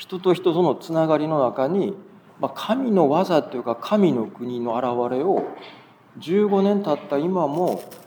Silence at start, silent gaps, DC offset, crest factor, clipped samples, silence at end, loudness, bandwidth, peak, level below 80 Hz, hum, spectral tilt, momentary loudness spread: 0 s; none; under 0.1%; 16 dB; under 0.1%; 0.05 s; -22 LUFS; over 20 kHz; -4 dBFS; -80 dBFS; none; -7.5 dB/octave; 10 LU